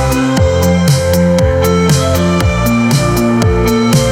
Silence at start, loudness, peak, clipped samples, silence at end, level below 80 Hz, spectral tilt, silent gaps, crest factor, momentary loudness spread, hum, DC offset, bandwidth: 0 s; -11 LUFS; 0 dBFS; under 0.1%; 0 s; -24 dBFS; -6 dB/octave; none; 10 dB; 2 LU; none; under 0.1%; 17.5 kHz